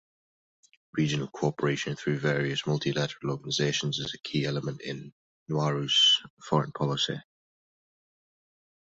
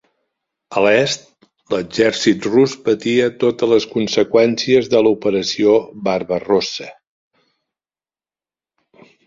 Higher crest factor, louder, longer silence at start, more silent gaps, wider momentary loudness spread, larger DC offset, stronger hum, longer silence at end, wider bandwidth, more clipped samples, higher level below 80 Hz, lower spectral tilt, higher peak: about the same, 20 dB vs 16 dB; second, -28 LUFS vs -16 LUFS; first, 0.95 s vs 0.7 s; first, 5.12-5.46 s, 6.30-6.37 s vs none; first, 13 LU vs 9 LU; neither; neither; second, 1.7 s vs 2.35 s; about the same, 8 kHz vs 7.8 kHz; neither; second, -64 dBFS vs -56 dBFS; about the same, -4.5 dB/octave vs -4.5 dB/octave; second, -10 dBFS vs -2 dBFS